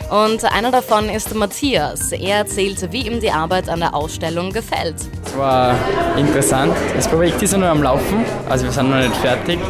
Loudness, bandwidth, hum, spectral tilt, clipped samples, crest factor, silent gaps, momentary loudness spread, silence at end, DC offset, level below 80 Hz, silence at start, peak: -17 LUFS; 16 kHz; none; -4.5 dB/octave; under 0.1%; 16 dB; none; 7 LU; 0 s; under 0.1%; -32 dBFS; 0 s; -2 dBFS